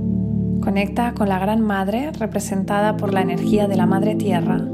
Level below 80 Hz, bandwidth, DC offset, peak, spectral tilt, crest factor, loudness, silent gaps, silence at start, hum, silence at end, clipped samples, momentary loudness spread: -40 dBFS; 14 kHz; under 0.1%; -4 dBFS; -7 dB/octave; 16 dB; -20 LUFS; none; 0 s; none; 0 s; under 0.1%; 5 LU